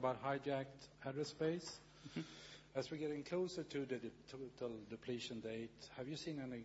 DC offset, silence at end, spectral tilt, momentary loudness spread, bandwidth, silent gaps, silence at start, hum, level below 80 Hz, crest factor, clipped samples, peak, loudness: under 0.1%; 0 s; -4.5 dB/octave; 11 LU; 7.6 kHz; none; 0 s; none; -74 dBFS; 18 dB; under 0.1%; -28 dBFS; -46 LUFS